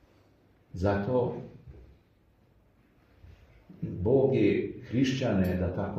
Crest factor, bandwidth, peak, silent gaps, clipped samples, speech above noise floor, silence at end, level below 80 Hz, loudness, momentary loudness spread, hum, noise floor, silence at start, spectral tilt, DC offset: 18 dB; 14.5 kHz; -12 dBFS; none; under 0.1%; 37 dB; 0 s; -54 dBFS; -28 LUFS; 16 LU; none; -64 dBFS; 0.75 s; -7.5 dB/octave; under 0.1%